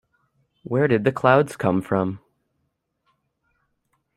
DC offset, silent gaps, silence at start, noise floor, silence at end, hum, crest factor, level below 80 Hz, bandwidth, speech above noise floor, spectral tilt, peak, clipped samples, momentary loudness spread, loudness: under 0.1%; none; 0.7 s; -74 dBFS; 2 s; none; 22 dB; -62 dBFS; 14 kHz; 54 dB; -7.5 dB/octave; -2 dBFS; under 0.1%; 10 LU; -21 LUFS